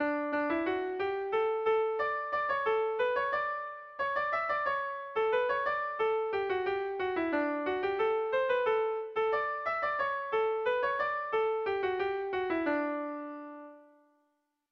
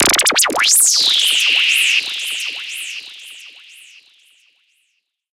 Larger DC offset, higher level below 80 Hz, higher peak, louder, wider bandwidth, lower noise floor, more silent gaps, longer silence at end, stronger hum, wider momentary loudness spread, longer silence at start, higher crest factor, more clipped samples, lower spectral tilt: neither; second, -68 dBFS vs -54 dBFS; second, -18 dBFS vs 0 dBFS; second, -31 LUFS vs -12 LUFS; second, 6 kHz vs 17 kHz; first, -78 dBFS vs -68 dBFS; neither; second, 0.9 s vs 1.8 s; neither; second, 5 LU vs 19 LU; about the same, 0 s vs 0 s; about the same, 14 dB vs 18 dB; neither; first, -6 dB/octave vs 1.5 dB/octave